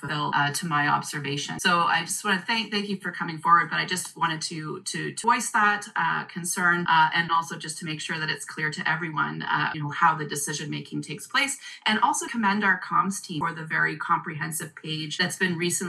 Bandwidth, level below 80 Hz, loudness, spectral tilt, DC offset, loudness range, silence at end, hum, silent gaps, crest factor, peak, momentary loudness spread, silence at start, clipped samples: 12.5 kHz; -74 dBFS; -25 LUFS; -3 dB/octave; under 0.1%; 3 LU; 0 s; none; none; 20 dB; -6 dBFS; 10 LU; 0 s; under 0.1%